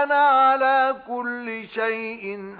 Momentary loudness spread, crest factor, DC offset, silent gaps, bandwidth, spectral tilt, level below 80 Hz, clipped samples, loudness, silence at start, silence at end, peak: 14 LU; 12 dB; under 0.1%; none; 4.9 kHz; -7 dB/octave; -70 dBFS; under 0.1%; -21 LUFS; 0 s; 0 s; -10 dBFS